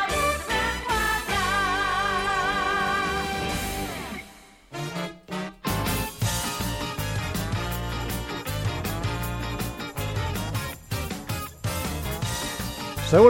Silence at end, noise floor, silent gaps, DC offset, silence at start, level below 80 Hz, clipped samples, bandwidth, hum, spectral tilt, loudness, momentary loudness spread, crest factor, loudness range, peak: 0 s; -49 dBFS; none; under 0.1%; 0 s; -38 dBFS; under 0.1%; 17 kHz; none; -4 dB/octave; -27 LUFS; 8 LU; 24 dB; 6 LU; -2 dBFS